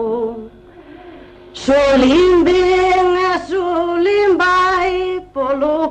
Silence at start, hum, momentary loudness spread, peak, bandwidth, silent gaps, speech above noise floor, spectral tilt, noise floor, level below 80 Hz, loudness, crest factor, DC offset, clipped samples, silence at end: 0 s; 50 Hz at -40 dBFS; 11 LU; -4 dBFS; 8.8 kHz; none; 28 dB; -4.5 dB/octave; -39 dBFS; -38 dBFS; -14 LUFS; 12 dB; under 0.1%; under 0.1%; 0 s